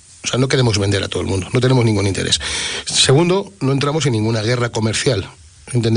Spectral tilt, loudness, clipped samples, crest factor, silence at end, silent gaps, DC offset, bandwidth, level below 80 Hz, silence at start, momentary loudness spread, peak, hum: -4.5 dB/octave; -17 LUFS; under 0.1%; 14 dB; 0 s; none; under 0.1%; 10 kHz; -44 dBFS; 0.25 s; 7 LU; -2 dBFS; none